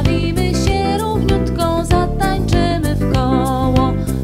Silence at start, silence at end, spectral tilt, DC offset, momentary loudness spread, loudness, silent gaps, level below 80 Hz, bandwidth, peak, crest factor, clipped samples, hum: 0 s; 0 s; -6.5 dB/octave; under 0.1%; 2 LU; -16 LUFS; none; -22 dBFS; 16 kHz; 0 dBFS; 14 dB; under 0.1%; none